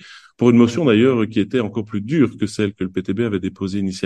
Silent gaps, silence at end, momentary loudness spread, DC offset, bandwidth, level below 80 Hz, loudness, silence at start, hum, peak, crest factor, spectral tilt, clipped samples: none; 0 s; 10 LU; under 0.1%; 10 kHz; -56 dBFS; -18 LUFS; 0.05 s; none; -2 dBFS; 16 dB; -7 dB/octave; under 0.1%